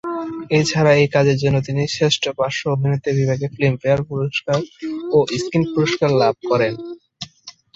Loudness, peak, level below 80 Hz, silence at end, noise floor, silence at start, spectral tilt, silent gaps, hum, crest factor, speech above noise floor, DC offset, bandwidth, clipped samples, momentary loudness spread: -18 LUFS; -2 dBFS; -52 dBFS; 0.25 s; -44 dBFS; 0.05 s; -5.5 dB/octave; none; none; 18 dB; 26 dB; under 0.1%; 8 kHz; under 0.1%; 13 LU